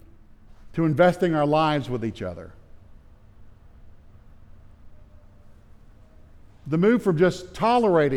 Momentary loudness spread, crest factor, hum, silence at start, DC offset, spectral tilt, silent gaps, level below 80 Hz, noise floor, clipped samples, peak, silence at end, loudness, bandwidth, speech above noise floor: 15 LU; 18 dB; none; 0.65 s; under 0.1%; -7.5 dB/octave; none; -50 dBFS; -49 dBFS; under 0.1%; -8 dBFS; 0 s; -22 LUFS; 13 kHz; 27 dB